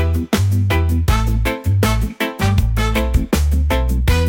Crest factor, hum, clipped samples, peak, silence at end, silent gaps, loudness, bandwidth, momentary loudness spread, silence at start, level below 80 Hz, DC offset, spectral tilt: 12 dB; none; under 0.1%; -4 dBFS; 0 s; none; -17 LUFS; 17 kHz; 3 LU; 0 s; -20 dBFS; under 0.1%; -6 dB/octave